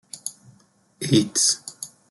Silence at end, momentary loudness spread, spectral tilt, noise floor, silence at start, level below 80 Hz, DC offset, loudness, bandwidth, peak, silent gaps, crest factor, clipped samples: 0.25 s; 17 LU; -3.5 dB/octave; -59 dBFS; 0.15 s; -62 dBFS; under 0.1%; -21 LUFS; 12.5 kHz; -6 dBFS; none; 20 dB; under 0.1%